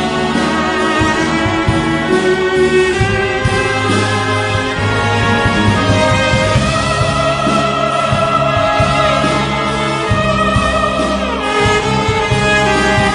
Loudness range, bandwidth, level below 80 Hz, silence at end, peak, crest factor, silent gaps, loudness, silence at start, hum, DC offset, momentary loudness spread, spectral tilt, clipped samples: 1 LU; 11 kHz; -30 dBFS; 0 s; 0 dBFS; 12 dB; none; -13 LUFS; 0 s; none; under 0.1%; 3 LU; -5 dB/octave; under 0.1%